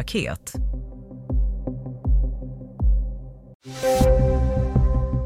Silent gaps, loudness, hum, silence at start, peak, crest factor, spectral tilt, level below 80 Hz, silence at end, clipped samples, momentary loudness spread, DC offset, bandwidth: 3.55-3.60 s; -24 LUFS; none; 0 s; -6 dBFS; 16 dB; -6.5 dB/octave; -24 dBFS; 0 s; under 0.1%; 20 LU; under 0.1%; 15.5 kHz